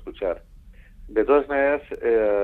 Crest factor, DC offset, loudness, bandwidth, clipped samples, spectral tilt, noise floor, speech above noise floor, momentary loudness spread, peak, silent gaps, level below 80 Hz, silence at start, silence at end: 16 dB; under 0.1%; -22 LUFS; 4.2 kHz; under 0.1%; -7.5 dB/octave; -46 dBFS; 24 dB; 9 LU; -8 dBFS; none; -46 dBFS; 0 s; 0 s